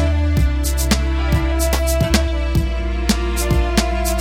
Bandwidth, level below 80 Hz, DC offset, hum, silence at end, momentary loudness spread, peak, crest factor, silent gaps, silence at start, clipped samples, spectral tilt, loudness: 16.5 kHz; -18 dBFS; under 0.1%; none; 0 s; 3 LU; -2 dBFS; 14 dB; none; 0 s; under 0.1%; -5 dB/octave; -18 LUFS